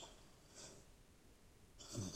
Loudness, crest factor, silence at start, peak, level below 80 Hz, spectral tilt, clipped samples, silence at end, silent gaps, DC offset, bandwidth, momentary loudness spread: -57 LUFS; 22 dB; 0 s; -34 dBFS; -68 dBFS; -4 dB/octave; under 0.1%; 0 s; none; under 0.1%; 16 kHz; 16 LU